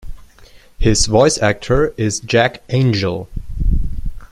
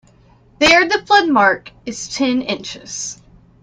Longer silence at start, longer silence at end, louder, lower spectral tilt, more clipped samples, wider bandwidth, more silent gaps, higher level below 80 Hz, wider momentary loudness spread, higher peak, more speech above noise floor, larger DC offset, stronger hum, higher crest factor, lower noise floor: second, 0.05 s vs 0.6 s; second, 0.05 s vs 0.5 s; about the same, -16 LUFS vs -15 LUFS; first, -4.5 dB/octave vs -2.5 dB/octave; neither; first, 12.5 kHz vs 10.5 kHz; neither; first, -24 dBFS vs -50 dBFS; second, 13 LU vs 16 LU; about the same, 0 dBFS vs 0 dBFS; second, 28 dB vs 34 dB; neither; neither; about the same, 16 dB vs 18 dB; second, -43 dBFS vs -50 dBFS